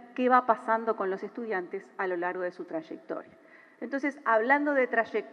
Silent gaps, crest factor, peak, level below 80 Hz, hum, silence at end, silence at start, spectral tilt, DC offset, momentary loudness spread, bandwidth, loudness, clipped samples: none; 22 dB; -8 dBFS; under -90 dBFS; none; 0.05 s; 0 s; -6 dB/octave; under 0.1%; 15 LU; 9.6 kHz; -28 LUFS; under 0.1%